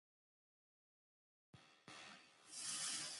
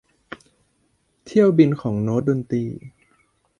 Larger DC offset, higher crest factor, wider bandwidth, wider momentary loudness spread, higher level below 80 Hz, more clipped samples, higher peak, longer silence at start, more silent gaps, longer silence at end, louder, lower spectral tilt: neither; about the same, 22 dB vs 20 dB; first, 16 kHz vs 10.5 kHz; about the same, 23 LU vs 25 LU; second, under -90 dBFS vs -58 dBFS; neither; second, -32 dBFS vs -2 dBFS; first, 1.55 s vs 1.25 s; neither; second, 0 s vs 0.7 s; second, -47 LUFS vs -20 LUFS; second, 0.5 dB/octave vs -9 dB/octave